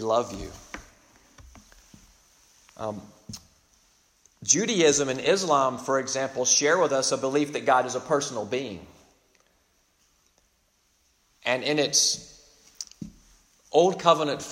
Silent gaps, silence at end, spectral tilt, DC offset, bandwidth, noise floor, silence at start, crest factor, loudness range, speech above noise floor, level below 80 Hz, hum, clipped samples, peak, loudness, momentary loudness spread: none; 0 s; -2.5 dB/octave; under 0.1%; 16 kHz; -68 dBFS; 0 s; 24 dB; 18 LU; 43 dB; -58 dBFS; none; under 0.1%; -4 dBFS; -24 LUFS; 22 LU